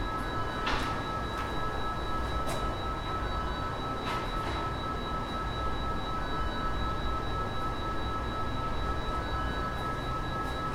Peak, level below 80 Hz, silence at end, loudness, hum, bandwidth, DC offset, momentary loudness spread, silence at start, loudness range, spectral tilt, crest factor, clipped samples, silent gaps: -16 dBFS; -38 dBFS; 0 s; -33 LUFS; none; 16 kHz; under 0.1%; 1 LU; 0 s; 1 LU; -5.5 dB/octave; 16 dB; under 0.1%; none